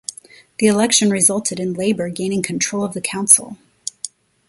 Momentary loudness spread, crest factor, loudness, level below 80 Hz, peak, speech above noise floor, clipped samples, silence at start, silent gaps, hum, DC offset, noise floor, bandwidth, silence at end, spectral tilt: 19 LU; 20 dB; -16 LUFS; -60 dBFS; 0 dBFS; 25 dB; under 0.1%; 0.1 s; none; none; under 0.1%; -42 dBFS; 16 kHz; 0.4 s; -3 dB/octave